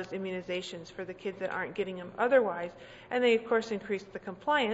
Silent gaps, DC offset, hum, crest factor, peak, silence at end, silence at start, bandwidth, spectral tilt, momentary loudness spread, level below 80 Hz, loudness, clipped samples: none; under 0.1%; none; 18 dB; -14 dBFS; 0 s; 0 s; 8 kHz; -5 dB/octave; 15 LU; -68 dBFS; -32 LUFS; under 0.1%